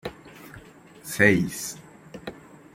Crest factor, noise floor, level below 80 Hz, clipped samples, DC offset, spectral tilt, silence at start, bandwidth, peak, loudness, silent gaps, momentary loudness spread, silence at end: 26 dB; -48 dBFS; -58 dBFS; under 0.1%; under 0.1%; -5 dB/octave; 0.05 s; 16.5 kHz; -2 dBFS; -23 LUFS; none; 26 LU; 0.35 s